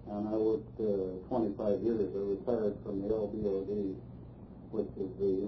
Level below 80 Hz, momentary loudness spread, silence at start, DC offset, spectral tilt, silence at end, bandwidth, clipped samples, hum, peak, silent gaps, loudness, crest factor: -56 dBFS; 9 LU; 0 s; under 0.1%; -9.5 dB/octave; 0 s; 5.4 kHz; under 0.1%; none; -18 dBFS; none; -34 LUFS; 16 dB